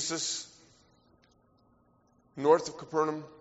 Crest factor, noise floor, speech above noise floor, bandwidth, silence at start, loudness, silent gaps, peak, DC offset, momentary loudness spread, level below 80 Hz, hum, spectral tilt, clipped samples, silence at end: 24 dB; -67 dBFS; 37 dB; 8 kHz; 0 s; -30 LUFS; none; -10 dBFS; under 0.1%; 17 LU; -74 dBFS; none; -3 dB/octave; under 0.1%; 0.15 s